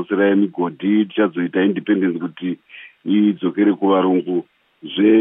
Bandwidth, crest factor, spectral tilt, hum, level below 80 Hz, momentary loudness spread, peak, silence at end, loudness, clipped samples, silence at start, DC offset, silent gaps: 3.8 kHz; 14 dB; -10.5 dB/octave; none; -76 dBFS; 11 LU; -4 dBFS; 0 s; -18 LUFS; under 0.1%; 0 s; under 0.1%; none